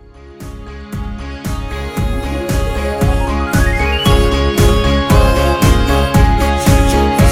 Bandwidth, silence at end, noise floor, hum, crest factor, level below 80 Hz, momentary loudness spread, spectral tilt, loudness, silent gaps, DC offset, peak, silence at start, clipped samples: 16.5 kHz; 0 s; -32 dBFS; none; 12 dB; -16 dBFS; 14 LU; -5.5 dB/octave; -14 LUFS; none; under 0.1%; 0 dBFS; 0.15 s; under 0.1%